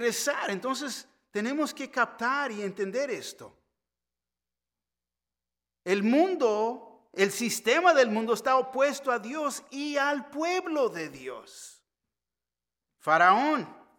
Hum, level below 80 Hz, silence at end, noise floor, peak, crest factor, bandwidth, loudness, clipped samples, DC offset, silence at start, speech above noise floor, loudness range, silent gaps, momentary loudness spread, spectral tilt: 60 Hz at -70 dBFS; -80 dBFS; 0.25 s; under -90 dBFS; -8 dBFS; 22 dB; 17.5 kHz; -27 LUFS; under 0.1%; under 0.1%; 0 s; over 63 dB; 9 LU; none; 16 LU; -3.5 dB/octave